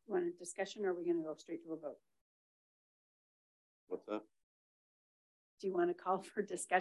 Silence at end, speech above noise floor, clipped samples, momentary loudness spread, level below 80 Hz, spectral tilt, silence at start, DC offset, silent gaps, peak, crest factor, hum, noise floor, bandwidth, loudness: 0 s; over 50 dB; under 0.1%; 11 LU; under -90 dBFS; -4.5 dB/octave; 0.1 s; under 0.1%; 2.21-3.87 s, 4.43-5.57 s; -20 dBFS; 22 dB; none; under -90 dBFS; 12 kHz; -41 LUFS